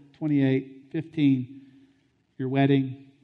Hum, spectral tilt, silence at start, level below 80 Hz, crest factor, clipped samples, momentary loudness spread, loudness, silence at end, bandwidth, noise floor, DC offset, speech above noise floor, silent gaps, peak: none; -10 dB/octave; 0.2 s; -70 dBFS; 18 dB; under 0.1%; 13 LU; -26 LUFS; 0.25 s; 4.3 kHz; -66 dBFS; under 0.1%; 42 dB; none; -10 dBFS